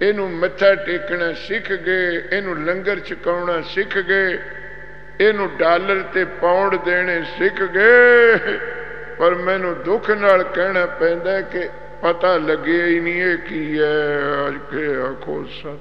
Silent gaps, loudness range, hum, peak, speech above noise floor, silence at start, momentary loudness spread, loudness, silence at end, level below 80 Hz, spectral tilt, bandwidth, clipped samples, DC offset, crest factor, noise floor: none; 6 LU; none; 0 dBFS; 20 dB; 0 s; 11 LU; -18 LUFS; 0 s; -48 dBFS; -7 dB/octave; 6.2 kHz; under 0.1%; 2%; 18 dB; -38 dBFS